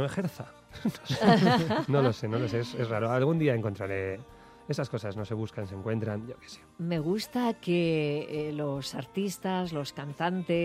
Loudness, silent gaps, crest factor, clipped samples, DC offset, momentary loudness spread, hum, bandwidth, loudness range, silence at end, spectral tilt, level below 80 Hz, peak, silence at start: -30 LUFS; none; 18 dB; under 0.1%; under 0.1%; 11 LU; none; 15.5 kHz; 8 LU; 0 s; -6.5 dB/octave; -62 dBFS; -10 dBFS; 0 s